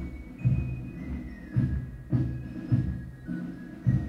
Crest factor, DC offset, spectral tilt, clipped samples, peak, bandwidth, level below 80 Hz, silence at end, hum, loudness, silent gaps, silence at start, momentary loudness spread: 18 dB; under 0.1%; -10 dB/octave; under 0.1%; -12 dBFS; 5.4 kHz; -40 dBFS; 0 s; none; -32 LUFS; none; 0 s; 10 LU